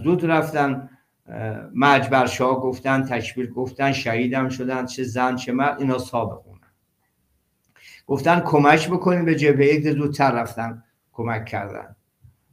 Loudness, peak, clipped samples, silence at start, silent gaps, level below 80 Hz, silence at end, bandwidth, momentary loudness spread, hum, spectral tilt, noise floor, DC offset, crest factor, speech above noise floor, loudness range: -21 LUFS; 0 dBFS; under 0.1%; 0 s; none; -60 dBFS; 0.65 s; 15.5 kHz; 14 LU; none; -6 dB/octave; -69 dBFS; under 0.1%; 20 dB; 49 dB; 6 LU